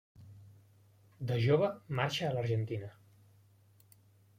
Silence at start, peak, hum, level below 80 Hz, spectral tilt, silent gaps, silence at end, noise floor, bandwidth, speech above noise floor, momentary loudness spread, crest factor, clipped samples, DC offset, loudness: 0.2 s; -16 dBFS; none; -70 dBFS; -6.5 dB/octave; none; 1.5 s; -65 dBFS; 15.5 kHz; 32 dB; 21 LU; 20 dB; under 0.1%; under 0.1%; -34 LUFS